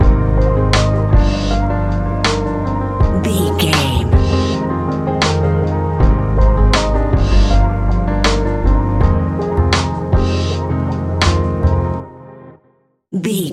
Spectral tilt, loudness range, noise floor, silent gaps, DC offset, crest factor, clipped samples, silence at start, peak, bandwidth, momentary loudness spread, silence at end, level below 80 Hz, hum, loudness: -6 dB/octave; 2 LU; -57 dBFS; none; under 0.1%; 14 dB; under 0.1%; 0 s; 0 dBFS; 13.5 kHz; 5 LU; 0 s; -18 dBFS; none; -15 LUFS